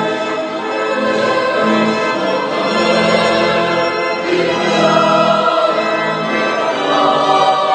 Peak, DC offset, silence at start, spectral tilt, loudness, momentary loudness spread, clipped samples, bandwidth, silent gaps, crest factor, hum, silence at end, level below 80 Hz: 0 dBFS; under 0.1%; 0 s; -4.5 dB/octave; -14 LUFS; 5 LU; under 0.1%; 9.8 kHz; none; 14 dB; none; 0 s; -60 dBFS